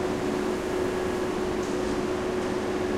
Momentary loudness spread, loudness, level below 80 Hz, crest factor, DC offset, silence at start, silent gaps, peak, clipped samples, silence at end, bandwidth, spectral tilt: 1 LU; -28 LUFS; -46 dBFS; 12 dB; under 0.1%; 0 s; none; -14 dBFS; under 0.1%; 0 s; 15.5 kHz; -5.5 dB/octave